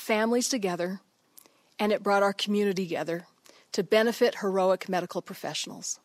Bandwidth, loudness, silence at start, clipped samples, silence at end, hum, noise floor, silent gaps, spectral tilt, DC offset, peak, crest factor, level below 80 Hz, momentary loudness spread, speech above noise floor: 16 kHz; -28 LUFS; 0 s; under 0.1%; 0.1 s; none; -58 dBFS; none; -4 dB/octave; under 0.1%; -10 dBFS; 18 dB; -78 dBFS; 10 LU; 31 dB